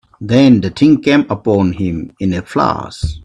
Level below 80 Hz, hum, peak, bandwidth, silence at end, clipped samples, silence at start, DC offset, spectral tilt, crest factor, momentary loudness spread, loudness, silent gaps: -36 dBFS; none; 0 dBFS; 10 kHz; 0.05 s; under 0.1%; 0.2 s; under 0.1%; -7 dB/octave; 14 dB; 10 LU; -13 LUFS; none